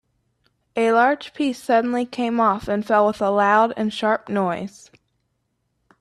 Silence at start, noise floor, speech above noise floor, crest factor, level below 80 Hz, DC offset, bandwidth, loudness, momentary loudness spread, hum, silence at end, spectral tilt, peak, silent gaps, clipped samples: 0.75 s; -72 dBFS; 52 dB; 16 dB; -58 dBFS; under 0.1%; 13.5 kHz; -20 LUFS; 8 LU; none; 1.3 s; -5.5 dB/octave; -4 dBFS; none; under 0.1%